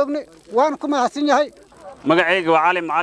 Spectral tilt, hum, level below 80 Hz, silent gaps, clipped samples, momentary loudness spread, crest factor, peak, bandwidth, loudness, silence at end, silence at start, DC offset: -4.5 dB/octave; none; -62 dBFS; none; under 0.1%; 10 LU; 18 dB; 0 dBFS; 11 kHz; -18 LUFS; 0 s; 0 s; under 0.1%